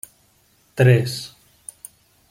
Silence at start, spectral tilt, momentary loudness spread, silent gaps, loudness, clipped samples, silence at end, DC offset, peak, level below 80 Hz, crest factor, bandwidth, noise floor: 0.75 s; -6 dB/octave; 25 LU; none; -18 LUFS; under 0.1%; 1.05 s; under 0.1%; -2 dBFS; -60 dBFS; 20 dB; 16.5 kHz; -59 dBFS